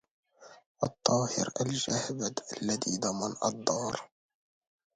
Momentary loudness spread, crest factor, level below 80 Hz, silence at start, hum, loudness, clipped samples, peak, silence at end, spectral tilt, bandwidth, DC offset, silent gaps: 8 LU; 26 dB; -68 dBFS; 0.4 s; none; -32 LUFS; under 0.1%; -8 dBFS; 0.9 s; -3.5 dB/octave; 10.5 kHz; under 0.1%; 0.66-0.75 s